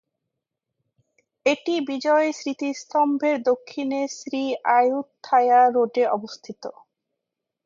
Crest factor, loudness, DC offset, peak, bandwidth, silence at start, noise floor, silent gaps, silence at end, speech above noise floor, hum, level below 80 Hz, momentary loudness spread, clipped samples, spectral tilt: 16 dB; -22 LUFS; under 0.1%; -6 dBFS; 7.6 kHz; 1.45 s; -84 dBFS; none; 0.95 s; 62 dB; none; -78 dBFS; 12 LU; under 0.1%; -3.5 dB/octave